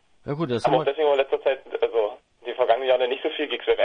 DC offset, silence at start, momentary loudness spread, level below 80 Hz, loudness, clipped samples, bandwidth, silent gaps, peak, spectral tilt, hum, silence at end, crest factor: under 0.1%; 0.25 s; 9 LU; -60 dBFS; -24 LUFS; under 0.1%; 10 kHz; none; -6 dBFS; -6 dB/octave; none; 0 s; 16 dB